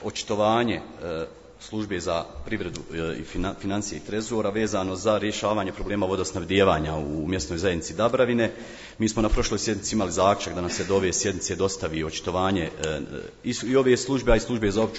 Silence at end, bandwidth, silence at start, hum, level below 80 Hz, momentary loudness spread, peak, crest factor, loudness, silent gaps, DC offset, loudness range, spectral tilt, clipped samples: 0 s; 8.2 kHz; 0 s; none; -40 dBFS; 10 LU; -6 dBFS; 20 dB; -26 LUFS; none; under 0.1%; 5 LU; -4.5 dB/octave; under 0.1%